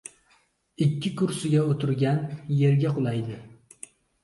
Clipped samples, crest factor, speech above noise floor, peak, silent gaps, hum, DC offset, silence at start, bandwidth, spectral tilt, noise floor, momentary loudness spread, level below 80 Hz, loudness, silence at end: under 0.1%; 16 dB; 41 dB; -10 dBFS; none; none; under 0.1%; 0.8 s; 11.5 kHz; -7 dB/octave; -65 dBFS; 22 LU; -64 dBFS; -25 LUFS; 0.7 s